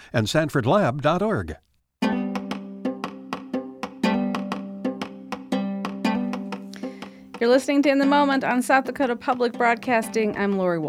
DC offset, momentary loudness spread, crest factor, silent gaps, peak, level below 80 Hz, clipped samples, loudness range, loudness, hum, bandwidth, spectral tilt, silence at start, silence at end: under 0.1%; 15 LU; 20 dB; none; -4 dBFS; -54 dBFS; under 0.1%; 8 LU; -23 LUFS; none; 15.5 kHz; -6 dB/octave; 0 s; 0 s